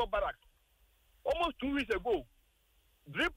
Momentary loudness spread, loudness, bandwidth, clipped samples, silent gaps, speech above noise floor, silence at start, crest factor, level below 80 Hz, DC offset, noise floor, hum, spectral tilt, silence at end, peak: 8 LU; -35 LUFS; 16 kHz; under 0.1%; none; 36 dB; 0 s; 16 dB; -52 dBFS; under 0.1%; -71 dBFS; none; -5 dB/octave; 0 s; -22 dBFS